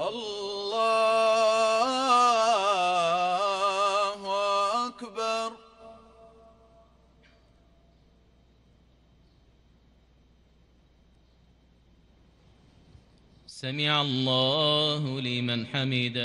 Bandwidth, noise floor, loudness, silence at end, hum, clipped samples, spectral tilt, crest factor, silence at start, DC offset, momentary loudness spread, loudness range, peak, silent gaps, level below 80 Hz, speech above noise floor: 11.5 kHz; -61 dBFS; -25 LUFS; 0 s; none; under 0.1%; -4 dB/octave; 18 dB; 0 s; under 0.1%; 10 LU; 14 LU; -10 dBFS; none; -64 dBFS; 34 dB